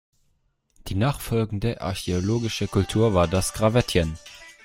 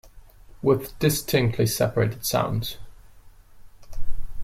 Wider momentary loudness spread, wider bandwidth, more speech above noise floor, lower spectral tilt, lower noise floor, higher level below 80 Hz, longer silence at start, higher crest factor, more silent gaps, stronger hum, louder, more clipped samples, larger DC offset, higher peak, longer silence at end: second, 10 LU vs 19 LU; about the same, 16.5 kHz vs 16.5 kHz; first, 45 dB vs 25 dB; about the same, -5.5 dB/octave vs -5 dB/octave; first, -68 dBFS vs -48 dBFS; about the same, -42 dBFS vs -38 dBFS; first, 0.85 s vs 0.15 s; about the same, 20 dB vs 16 dB; neither; neither; about the same, -24 LUFS vs -24 LUFS; neither; neither; first, -4 dBFS vs -8 dBFS; first, 0.15 s vs 0 s